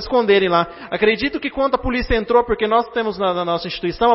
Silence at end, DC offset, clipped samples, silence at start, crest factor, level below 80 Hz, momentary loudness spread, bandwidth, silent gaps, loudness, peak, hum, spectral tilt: 0 s; under 0.1%; under 0.1%; 0 s; 16 dB; -36 dBFS; 7 LU; 5.8 kHz; none; -18 LUFS; -2 dBFS; none; -9 dB/octave